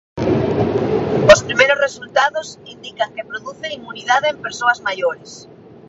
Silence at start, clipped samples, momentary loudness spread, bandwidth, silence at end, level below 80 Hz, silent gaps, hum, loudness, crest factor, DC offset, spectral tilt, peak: 0.15 s; under 0.1%; 18 LU; 8 kHz; 0.45 s; -44 dBFS; none; none; -17 LUFS; 18 dB; under 0.1%; -4 dB/octave; 0 dBFS